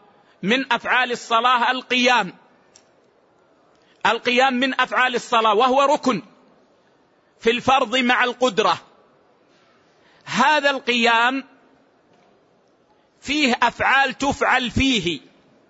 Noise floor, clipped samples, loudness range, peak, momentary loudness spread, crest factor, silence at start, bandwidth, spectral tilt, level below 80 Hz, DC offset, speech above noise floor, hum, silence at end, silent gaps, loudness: -59 dBFS; under 0.1%; 2 LU; -4 dBFS; 8 LU; 18 dB; 0.45 s; 8 kHz; -3.5 dB/octave; -50 dBFS; under 0.1%; 40 dB; none; 0.5 s; none; -19 LUFS